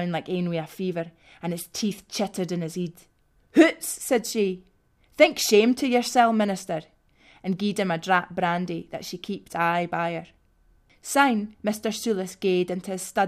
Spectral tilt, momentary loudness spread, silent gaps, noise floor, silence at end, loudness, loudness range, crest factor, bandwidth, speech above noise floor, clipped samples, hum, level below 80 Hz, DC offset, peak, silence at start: -4.5 dB/octave; 14 LU; none; -61 dBFS; 0 s; -25 LUFS; 5 LU; 22 dB; 15.5 kHz; 36 dB; under 0.1%; none; -64 dBFS; under 0.1%; -4 dBFS; 0 s